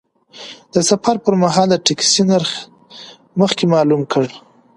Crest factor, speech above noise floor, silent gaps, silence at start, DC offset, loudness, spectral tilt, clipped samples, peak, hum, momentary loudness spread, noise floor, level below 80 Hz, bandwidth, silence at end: 16 dB; 25 dB; none; 0.35 s; under 0.1%; -15 LUFS; -4 dB/octave; under 0.1%; 0 dBFS; none; 21 LU; -40 dBFS; -58 dBFS; 11.5 kHz; 0.4 s